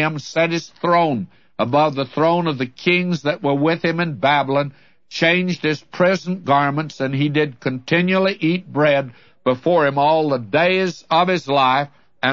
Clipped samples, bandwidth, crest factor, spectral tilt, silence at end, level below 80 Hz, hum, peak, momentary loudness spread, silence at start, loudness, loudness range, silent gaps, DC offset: under 0.1%; 7.4 kHz; 16 dB; -6 dB/octave; 0 s; -64 dBFS; none; -2 dBFS; 7 LU; 0 s; -18 LUFS; 2 LU; none; 0.2%